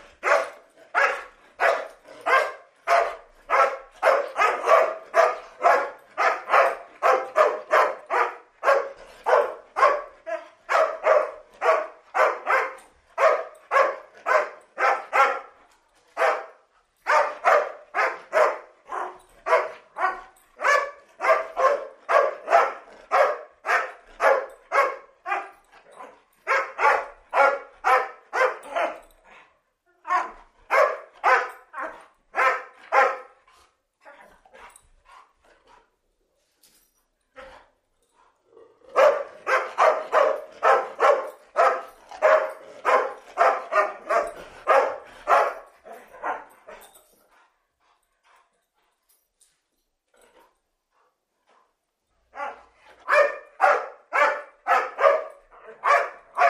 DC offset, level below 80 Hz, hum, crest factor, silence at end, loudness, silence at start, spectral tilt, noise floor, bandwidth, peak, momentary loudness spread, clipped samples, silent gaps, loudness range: under 0.1%; -68 dBFS; none; 22 dB; 0 s; -23 LUFS; 0.25 s; -1 dB/octave; -76 dBFS; 14.5 kHz; -2 dBFS; 14 LU; under 0.1%; none; 5 LU